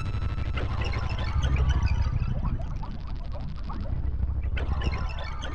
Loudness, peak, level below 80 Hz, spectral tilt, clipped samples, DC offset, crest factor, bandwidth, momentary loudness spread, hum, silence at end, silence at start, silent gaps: -30 LUFS; -12 dBFS; -30 dBFS; -6.5 dB/octave; under 0.1%; under 0.1%; 14 dB; 6.8 kHz; 11 LU; none; 0 s; 0 s; none